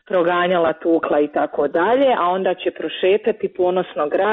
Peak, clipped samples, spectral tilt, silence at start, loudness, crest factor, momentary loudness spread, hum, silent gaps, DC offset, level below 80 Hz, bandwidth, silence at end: -6 dBFS; under 0.1%; -3.5 dB/octave; 0.1 s; -18 LUFS; 12 dB; 5 LU; none; none; under 0.1%; -60 dBFS; 4.1 kHz; 0 s